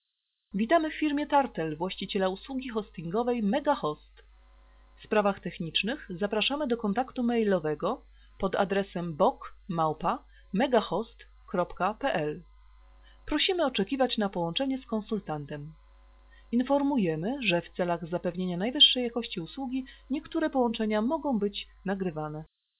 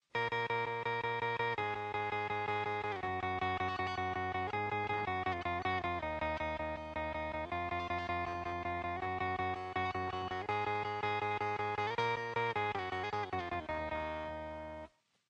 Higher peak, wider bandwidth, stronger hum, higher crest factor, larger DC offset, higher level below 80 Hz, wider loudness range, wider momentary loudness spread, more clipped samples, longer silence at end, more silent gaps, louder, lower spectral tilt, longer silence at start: first, -8 dBFS vs -20 dBFS; second, 4 kHz vs 9.4 kHz; neither; about the same, 20 dB vs 18 dB; neither; about the same, -56 dBFS vs -58 dBFS; first, 5 LU vs 2 LU; first, 10 LU vs 4 LU; neither; about the same, 0.35 s vs 0.4 s; neither; first, -29 LUFS vs -37 LUFS; second, -3 dB/octave vs -6 dB/octave; first, 0.55 s vs 0.15 s